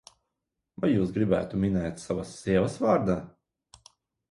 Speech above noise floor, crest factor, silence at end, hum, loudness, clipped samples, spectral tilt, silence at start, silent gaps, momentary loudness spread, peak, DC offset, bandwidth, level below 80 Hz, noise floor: 58 dB; 20 dB; 1 s; none; -27 LUFS; under 0.1%; -7.5 dB/octave; 0.8 s; none; 8 LU; -10 dBFS; under 0.1%; 11.5 kHz; -50 dBFS; -84 dBFS